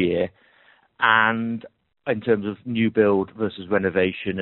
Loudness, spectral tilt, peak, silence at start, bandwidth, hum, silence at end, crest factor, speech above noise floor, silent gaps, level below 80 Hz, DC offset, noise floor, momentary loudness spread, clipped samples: -22 LUFS; -4 dB/octave; -2 dBFS; 0 s; 4.2 kHz; none; 0 s; 20 dB; 36 dB; none; -60 dBFS; under 0.1%; -57 dBFS; 11 LU; under 0.1%